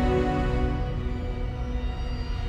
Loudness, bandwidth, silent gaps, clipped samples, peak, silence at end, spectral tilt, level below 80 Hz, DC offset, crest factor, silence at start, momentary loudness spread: -29 LUFS; 8.2 kHz; none; under 0.1%; -14 dBFS; 0 s; -8 dB/octave; -30 dBFS; under 0.1%; 14 dB; 0 s; 8 LU